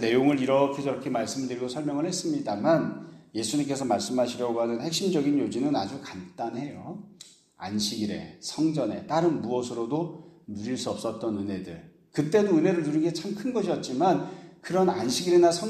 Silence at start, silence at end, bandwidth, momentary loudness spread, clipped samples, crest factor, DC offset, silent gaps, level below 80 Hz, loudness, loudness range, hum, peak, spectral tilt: 0 s; 0 s; 13.5 kHz; 14 LU; under 0.1%; 18 dB; under 0.1%; none; -68 dBFS; -27 LUFS; 5 LU; none; -8 dBFS; -5 dB/octave